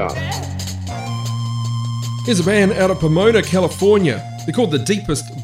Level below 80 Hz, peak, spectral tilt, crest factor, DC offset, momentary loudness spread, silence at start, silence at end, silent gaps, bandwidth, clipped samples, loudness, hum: -42 dBFS; -2 dBFS; -5.5 dB/octave; 16 dB; under 0.1%; 10 LU; 0 s; 0 s; none; 16 kHz; under 0.1%; -18 LUFS; none